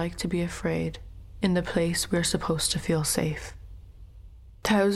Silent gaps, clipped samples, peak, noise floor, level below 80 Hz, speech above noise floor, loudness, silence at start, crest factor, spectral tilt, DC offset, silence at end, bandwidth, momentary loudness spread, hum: none; under 0.1%; -10 dBFS; -47 dBFS; -44 dBFS; 21 dB; -27 LUFS; 0 s; 18 dB; -4.5 dB/octave; under 0.1%; 0 s; 15.5 kHz; 13 LU; none